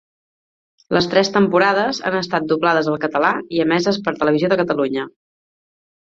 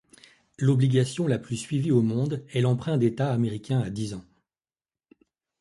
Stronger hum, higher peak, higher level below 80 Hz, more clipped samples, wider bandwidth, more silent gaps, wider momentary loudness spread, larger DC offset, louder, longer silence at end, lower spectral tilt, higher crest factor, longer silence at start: neither; first, -2 dBFS vs -10 dBFS; about the same, -58 dBFS vs -60 dBFS; neither; second, 7.8 kHz vs 11.5 kHz; neither; about the same, 6 LU vs 8 LU; neither; first, -18 LUFS vs -26 LUFS; second, 1.05 s vs 1.4 s; second, -5.5 dB/octave vs -7 dB/octave; about the same, 18 dB vs 16 dB; first, 0.9 s vs 0.6 s